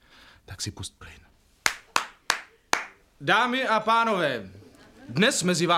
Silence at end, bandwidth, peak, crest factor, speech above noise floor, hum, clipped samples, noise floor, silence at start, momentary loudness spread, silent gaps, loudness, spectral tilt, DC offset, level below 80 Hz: 0 s; 16 kHz; -2 dBFS; 26 dB; 28 dB; none; under 0.1%; -53 dBFS; 0.5 s; 16 LU; none; -25 LUFS; -3 dB/octave; under 0.1%; -60 dBFS